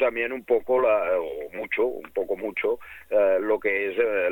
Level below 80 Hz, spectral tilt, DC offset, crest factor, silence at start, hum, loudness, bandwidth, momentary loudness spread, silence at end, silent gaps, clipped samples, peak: -60 dBFS; -6 dB/octave; under 0.1%; 14 dB; 0 s; none; -25 LUFS; 17.5 kHz; 8 LU; 0 s; none; under 0.1%; -10 dBFS